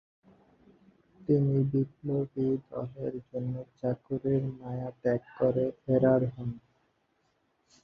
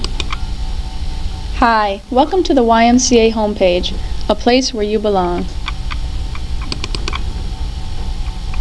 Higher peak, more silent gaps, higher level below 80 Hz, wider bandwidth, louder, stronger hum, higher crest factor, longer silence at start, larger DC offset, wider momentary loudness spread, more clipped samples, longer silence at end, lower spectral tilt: second, -12 dBFS vs 0 dBFS; neither; second, -62 dBFS vs -22 dBFS; second, 5 kHz vs 11 kHz; second, -30 LUFS vs -16 LUFS; neither; about the same, 20 dB vs 16 dB; first, 1.2 s vs 0 s; second, under 0.1% vs 0.4%; second, 12 LU vs 15 LU; neither; first, 1.25 s vs 0 s; first, -11 dB/octave vs -4.5 dB/octave